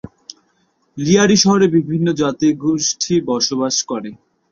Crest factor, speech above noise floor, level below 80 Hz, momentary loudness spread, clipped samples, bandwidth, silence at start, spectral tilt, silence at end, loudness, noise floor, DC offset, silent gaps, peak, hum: 16 dB; 46 dB; -52 dBFS; 14 LU; under 0.1%; 7.6 kHz; 0.95 s; -4 dB/octave; 0.35 s; -16 LUFS; -62 dBFS; under 0.1%; none; -2 dBFS; none